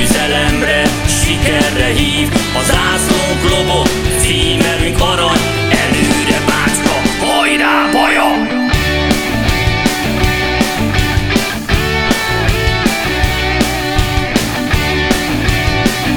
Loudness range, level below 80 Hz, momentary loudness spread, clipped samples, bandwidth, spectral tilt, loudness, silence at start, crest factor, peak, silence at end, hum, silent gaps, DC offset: 2 LU; -22 dBFS; 3 LU; under 0.1%; over 20 kHz; -4 dB/octave; -12 LUFS; 0 s; 12 dB; 0 dBFS; 0 s; none; none; under 0.1%